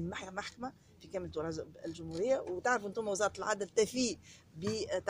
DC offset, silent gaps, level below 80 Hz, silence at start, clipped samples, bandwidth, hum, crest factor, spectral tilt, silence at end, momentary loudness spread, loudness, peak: under 0.1%; none; -64 dBFS; 0 s; under 0.1%; 15.5 kHz; none; 18 dB; -4 dB/octave; 0 s; 12 LU; -36 LUFS; -18 dBFS